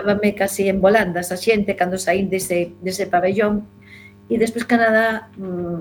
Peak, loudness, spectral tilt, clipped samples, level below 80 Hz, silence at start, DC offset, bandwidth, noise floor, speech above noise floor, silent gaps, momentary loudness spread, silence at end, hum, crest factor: -2 dBFS; -19 LUFS; -5 dB/octave; under 0.1%; -48 dBFS; 0 s; under 0.1%; 19 kHz; -43 dBFS; 25 dB; none; 10 LU; 0 s; none; 18 dB